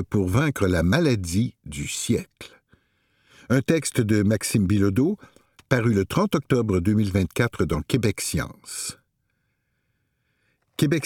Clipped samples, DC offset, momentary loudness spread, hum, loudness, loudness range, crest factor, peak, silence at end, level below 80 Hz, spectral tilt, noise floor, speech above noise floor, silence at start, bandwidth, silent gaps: under 0.1%; under 0.1%; 10 LU; none; -23 LUFS; 5 LU; 20 dB; -4 dBFS; 0 s; -44 dBFS; -5.5 dB/octave; -73 dBFS; 51 dB; 0 s; 17.5 kHz; none